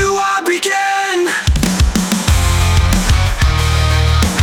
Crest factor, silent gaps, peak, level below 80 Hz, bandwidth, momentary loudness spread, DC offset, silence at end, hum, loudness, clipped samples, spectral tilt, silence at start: 12 dB; none; 0 dBFS; -18 dBFS; 18.5 kHz; 2 LU; under 0.1%; 0 s; none; -14 LUFS; under 0.1%; -4.5 dB/octave; 0 s